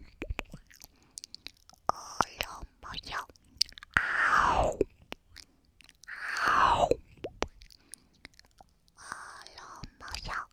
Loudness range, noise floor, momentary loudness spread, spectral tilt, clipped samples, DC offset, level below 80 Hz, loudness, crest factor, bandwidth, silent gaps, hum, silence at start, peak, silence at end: 9 LU; -62 dBFS; 25 LU; -3 dB/octave; under 0.1%; under 0.1%; -50 dBFS; -31 LUFS; 28 dB; 18 kHz; none; none; 0 s; -6 dBFS; 0.05 s